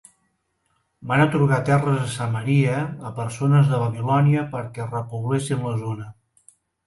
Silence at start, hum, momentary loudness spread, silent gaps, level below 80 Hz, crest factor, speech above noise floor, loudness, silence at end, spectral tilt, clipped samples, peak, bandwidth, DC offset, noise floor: 1 s; none; 12 LU; none; -58 dBFS; 18 dB; 50 dB; -22 LUFS; 0.75 s; -7 dB/octave; under 0.1%; -4 dBFS; 11.5 kHz; under 0.1%; -71 dBFS